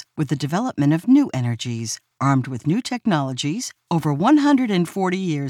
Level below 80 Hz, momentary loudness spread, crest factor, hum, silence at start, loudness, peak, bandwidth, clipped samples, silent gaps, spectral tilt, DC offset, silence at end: -64 dBFS; 9 LU; 16 dB; none; 0.15 s; -20 LUFS; -4 dBFS; 14 kHz; under 0.1%; none; -6 dB/octave; under 0.1%; 0 s